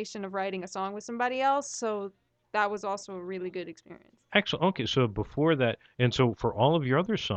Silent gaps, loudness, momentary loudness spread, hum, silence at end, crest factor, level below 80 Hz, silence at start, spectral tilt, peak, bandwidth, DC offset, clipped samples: none; -29 LUFS; 11 LU; none; 0 s; 20 dB; -58 dBFS; 0 s; -5.5 dB/octave; -8 dBFS; 8.8 kHz; under 0.1%; under 0.1%